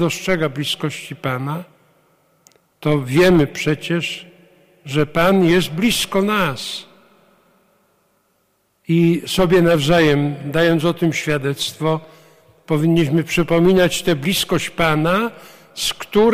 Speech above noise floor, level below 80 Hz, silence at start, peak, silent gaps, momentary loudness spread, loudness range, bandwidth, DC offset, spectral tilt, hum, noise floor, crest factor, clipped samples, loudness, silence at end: 47 dB; -42 dBFS; 0 s; -6 dBFS; none; 11 LU; 5 LU; 16 kHz; under 0.1%; -5.5 dB/octave; none; -64 dBFS; 12 dB; under 0.1%; -17 LUFS; 0 s